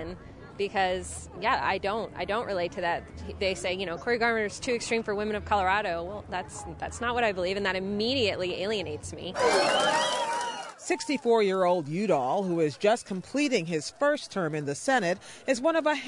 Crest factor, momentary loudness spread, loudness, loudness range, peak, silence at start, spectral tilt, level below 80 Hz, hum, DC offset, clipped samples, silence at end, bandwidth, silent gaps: 16 dB; 10 LU; -28 LUFS; 3 LU; -12 dBFS; 0 s; -4 dB/octave; -54 dBFS; none; under 0.1%; under 0.1%; 0 s; 11 kHz; none